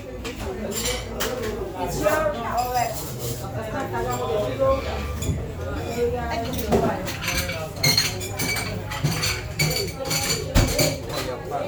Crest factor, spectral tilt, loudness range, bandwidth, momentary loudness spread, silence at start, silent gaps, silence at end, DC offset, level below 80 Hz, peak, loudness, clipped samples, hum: 20 dB; -3.5 dB/octave; 3 LU; over 20 kHz; 8 LU; 0 s; none; 0 s; under 0.1%; -36 dBFS; -4 dBFS; -24 LUFS; under 0.1%; none